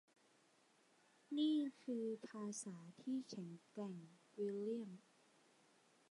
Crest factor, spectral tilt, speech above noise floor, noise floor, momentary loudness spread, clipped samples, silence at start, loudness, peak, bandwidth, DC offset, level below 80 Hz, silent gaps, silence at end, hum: 18 dB; -5.5 dB/octave; 30 dB; -75 dBFS; 15 LU; under 0.1%; 1.3 s; -46 LUFS; -30 dBFS; 11 kHz; under 0.1%; under -90 dBFS; none; 1.1 s; none